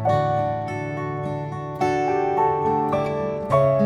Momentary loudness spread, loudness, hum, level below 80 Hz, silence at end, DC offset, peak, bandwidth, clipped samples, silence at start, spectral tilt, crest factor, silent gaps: 8 LU; -23 LUFS; none; -50 dBFS; 0 s; under 0.1%; -8 dBFS; 11 kHz; under 0.1%; 0 s; -8 dB/octave; 14 dB; none